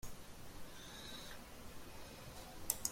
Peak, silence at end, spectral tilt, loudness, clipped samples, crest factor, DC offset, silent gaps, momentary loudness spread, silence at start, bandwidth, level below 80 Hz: -16 dBFS; 0 s; -2 dB/octave; -50 LUFS; under 0.1%; 32 dB; under 0.1%; none; 11 LU; 0 s; 16.5 kHz; -60 dBFS